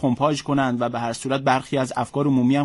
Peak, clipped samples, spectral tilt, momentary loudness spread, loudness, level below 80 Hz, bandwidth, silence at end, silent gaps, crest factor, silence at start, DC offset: -6 dBFS; under 0.1%; -6 dB/octave; 5 LU; -22 LUFS; -56 dBFS; 11.5 kHz; 0 s; none; 14 dB; 0 s; under 0.1%